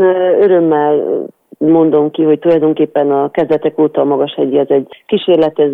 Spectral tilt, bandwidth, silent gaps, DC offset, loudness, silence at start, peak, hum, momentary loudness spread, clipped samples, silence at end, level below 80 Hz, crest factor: -9 dB/octave; 4.3 kHz; none; under 0.1%; -12 LUFS; 0 s; -2 dBFS; none; 6 LU; under 0.1%; 0 s; -58 dBFS; 10 dB